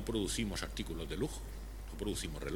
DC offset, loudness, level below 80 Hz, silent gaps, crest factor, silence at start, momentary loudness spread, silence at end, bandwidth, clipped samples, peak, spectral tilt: under 0.1%; -40 LUFS; -44 dBFS; none; 18 dB; 0 s; 12 LU; 0 s; 18.5 kHz; under 0.1%; -20 dBFS; -4.5 dB/octave